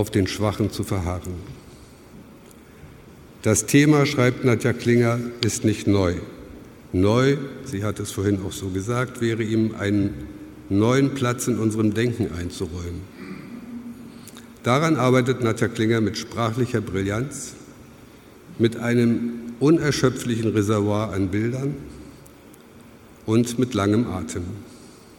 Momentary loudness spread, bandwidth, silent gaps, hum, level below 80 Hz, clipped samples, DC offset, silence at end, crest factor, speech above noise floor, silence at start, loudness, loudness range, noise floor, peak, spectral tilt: 18 LU; 17 kHz; none; none; -48 dBFS; under 0.1%; under 0.1%; 0.05 s; 20 dB; 25 dB; 0 s; -22 LUFS; 5 LU; -46 dBFS; -2 dBFS; -6 dB/octave